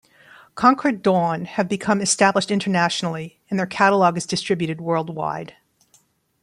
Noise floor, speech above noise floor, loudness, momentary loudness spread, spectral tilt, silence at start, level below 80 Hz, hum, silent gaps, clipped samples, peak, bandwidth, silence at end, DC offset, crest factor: -60 dBFS; 40 dB; -20 LUFS; 11 LU; -4.5 dB/octave; 0.55 s; -62 dBFS; none; none; under 0.1%; -2 dBFS; 11.5 kHz; 0.95 s; under 0.1%; 18 dB